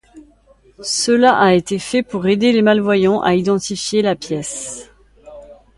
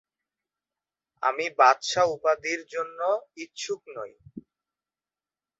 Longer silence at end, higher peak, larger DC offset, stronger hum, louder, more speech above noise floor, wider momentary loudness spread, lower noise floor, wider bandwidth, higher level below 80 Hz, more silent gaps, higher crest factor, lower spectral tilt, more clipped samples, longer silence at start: second, 0.25 s vs 1.2 s; first, 0 dBFS vs -6 dBFS; neither; neither; first, -16 LUFS vs -26 LUFS; second, 36 dB vs over 64 dB; second, 12 LU vs 19 LU; second, -51 dBFS vs under -90 dBFS; first, 11.5 kHz vs 8.4 kHz; first, -52 dBFS vs -72 dBFS; neither; second, 16 dB vs 22 dB; first, -4.5 dB/octave vs -2 dB/octave; neither; second, 0.15 s vs 1.2 s